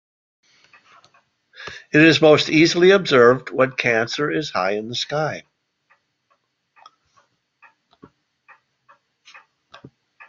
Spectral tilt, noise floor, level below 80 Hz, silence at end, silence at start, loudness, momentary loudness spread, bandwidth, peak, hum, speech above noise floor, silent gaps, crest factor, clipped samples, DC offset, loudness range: -5 dB/octave; -68 dBFS; -62 dBFS; 4.9 s; 1.6 s; -17 LUFS; 14 LU; 7.6 kHz; -2 dBFS; none; 51 dB; none; 20 dB; under 0.1%; under 0.1%; 14 LU